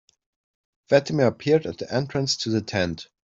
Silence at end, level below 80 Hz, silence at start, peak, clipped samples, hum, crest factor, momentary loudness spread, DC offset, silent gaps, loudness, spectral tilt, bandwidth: 0.3 s; -60 dBFS; 0.9 s; -4 dBFS; under 0.1%; none; 20 dB; 7 LU; under 0.1%; none; -23 LUFS; -5 dB/octave; 7.8 kHz